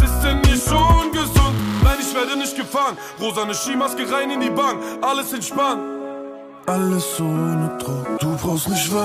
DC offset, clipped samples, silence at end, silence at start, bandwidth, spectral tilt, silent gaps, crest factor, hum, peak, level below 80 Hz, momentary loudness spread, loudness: under 0.1%; under 0.1%; 0 s; 0 s; 15.5 kHz; -4.5 dB/octave; none; 16 dB; none; -4 dBFS; -26 dBFS; 9 LU; -20 LUFS